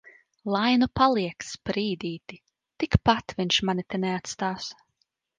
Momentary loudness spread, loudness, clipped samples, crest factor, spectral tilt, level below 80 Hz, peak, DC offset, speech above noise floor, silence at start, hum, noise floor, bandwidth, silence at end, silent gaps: 13 LU; -26 LUFS; under 0.1%; 22 dB; -5 dB/octave; -46 dBFS; -4 dBFS; under 0.1%; 49 dB; 0.45 s; none; -75 dBFS; 9.8 kHz; 0.65 s; none